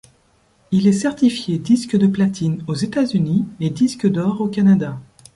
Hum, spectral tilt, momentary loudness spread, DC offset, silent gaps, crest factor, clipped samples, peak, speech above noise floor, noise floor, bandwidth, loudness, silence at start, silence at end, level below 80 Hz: none; -7 dB/octave; 7 LU; under 0.1%; none; 14 dB; under 0.1%; -4 dBFS; 41 dB; -58 dBFS; 11.5 kHz; -18 LUFS; 0.7 s; 0.3 s; -54 dBFS